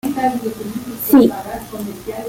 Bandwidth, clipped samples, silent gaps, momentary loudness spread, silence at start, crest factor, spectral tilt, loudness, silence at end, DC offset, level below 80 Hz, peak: 17 kHz; under 0.1%; none; 16 LU; 0.05 s; 16 dB; -5.5 dB/octave; -17 LUFS; 0 s; under 0.1%; -48 dBFS; -2 dBFS